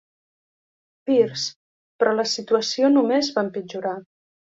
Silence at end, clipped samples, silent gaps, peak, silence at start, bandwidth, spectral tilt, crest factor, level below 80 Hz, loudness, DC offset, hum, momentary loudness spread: 0.55 s; under 0.1%; 1.56-1.99 s; -6 dBFS; 1.05 s; 7.8 kHz; -4 dB/octave; 18 dB; -72 dBFS; -22 LUFS; under 0.1%; none; 11 LU